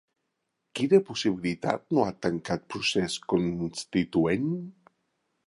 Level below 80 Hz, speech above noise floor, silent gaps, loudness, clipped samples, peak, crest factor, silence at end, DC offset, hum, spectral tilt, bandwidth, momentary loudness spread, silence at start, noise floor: -58 dBFS; 53 dB; none; -28 LUFS; under 0.1%; -8 dBFS; 20 dB; 0.75 s; under 0.1%; none; -5.5 dB/octave; 11.5 kHz; 9 LU; 0.75 s; -80 dBFS